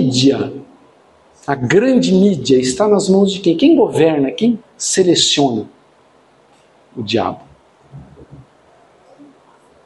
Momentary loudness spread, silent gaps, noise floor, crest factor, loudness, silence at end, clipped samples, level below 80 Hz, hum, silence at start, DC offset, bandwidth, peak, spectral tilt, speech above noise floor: 14 LU; none; -51 dBFS; 16 dB; -14 LUFS; 1.6 s; under 0.1%; -54 dBFS; none; 0 s; under 0.1%; 11.5 kHz; 0 dBFS; -4.5 dB/octave; 37 dB